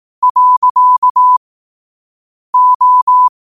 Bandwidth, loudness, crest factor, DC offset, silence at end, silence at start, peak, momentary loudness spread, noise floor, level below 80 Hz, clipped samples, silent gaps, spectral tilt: 1.3 kHz; -9 LUFS; 8 dB; 0.3%; 0.2 s; 0.2 s; -4 dBFS; 5 LU; under -90 dBFS; -66 dBFS; under 0.1%; 0.30-0.35 s, 0.57-0.62 s, 0.70-0.75 s, 0.98-1.02 s, 1.10-1.15 s, 1.37-2.53 s, 2.75-2.80 s, 3.02-3.07 s; -1 dB/octave